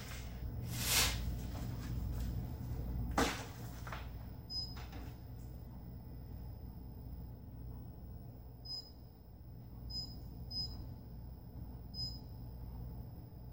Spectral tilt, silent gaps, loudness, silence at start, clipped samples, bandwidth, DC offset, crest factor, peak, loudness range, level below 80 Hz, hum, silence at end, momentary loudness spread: -3.5 dB/octave; none; -43 LUFS; 0 s; under 0.1%; 16 kHz; under 0.1%; 26 dB; -18 dBFS; 12 LU; -48 dBFS; none; 0 s; 16 LU